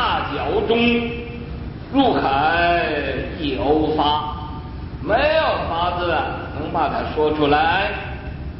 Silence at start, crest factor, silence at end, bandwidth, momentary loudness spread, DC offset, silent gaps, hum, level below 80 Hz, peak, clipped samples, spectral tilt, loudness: 0 s; 16 dB; 0 s; 5.8 kHz; 14 LU; under 0.1%; none; none; -34 dBFS; -4 dBFS; under 0.1%; -10.5 dB/octave; -20 LUFS